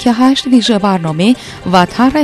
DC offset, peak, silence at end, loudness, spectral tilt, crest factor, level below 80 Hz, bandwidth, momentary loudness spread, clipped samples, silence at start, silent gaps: under 0.1%; 0 dBFS; 0 s; -11 LUFS; -5.5 dB/octave; 10 dB; -42 dBFS; 12.5 kHz; 4 LU; 0.4%; 0 s; none